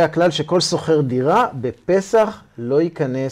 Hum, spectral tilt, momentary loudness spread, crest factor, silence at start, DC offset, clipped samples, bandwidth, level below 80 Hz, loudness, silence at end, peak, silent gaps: none; -5.5 dB/octave; 6 LU; 14 dB; 0 s; under 0.1%; under 0.1%; 15 kHz; -56 dBFS; -18 LUFS; 0 s; -4 dBFS; none